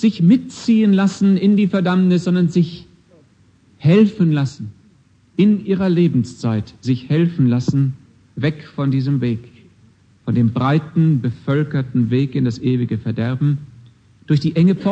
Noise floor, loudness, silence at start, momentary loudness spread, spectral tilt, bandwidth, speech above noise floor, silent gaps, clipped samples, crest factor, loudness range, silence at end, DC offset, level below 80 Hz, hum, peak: -53 dBFS; -17 LUFS; 0 s; 9 LU; -8.5 dB/octave; 8.4 kHz; 37 dB; none; under 0.1%; 14 dB; 3 LU; 0 s; under 0.1%; -54 dBFS; none; -2 dBFS